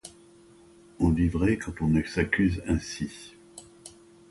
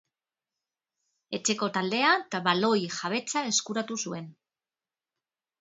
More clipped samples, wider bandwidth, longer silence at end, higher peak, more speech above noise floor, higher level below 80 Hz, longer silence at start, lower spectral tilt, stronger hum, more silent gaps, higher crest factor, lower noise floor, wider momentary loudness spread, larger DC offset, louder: neither; first, 11.5 kHz vs 8.2 kHz; second, 0.4 s vs 1.3 s; about the same, -10 dBFS vs -8 dBFS; second, 28 dB vs over 62 dB; first, -40 dBFS vs -78 dBFS; second, 0.05 s vs 1.3 s; first, -6.5 dB/octave vs -2.5 dB/octave; neither; neither; about the same, 18 dB vs 22 dB; second, -54 dBFS vs under -90 dBFS; first, 23 LU vs 11 LU; neither; about the same, -27 LUFS vs -27 LUFS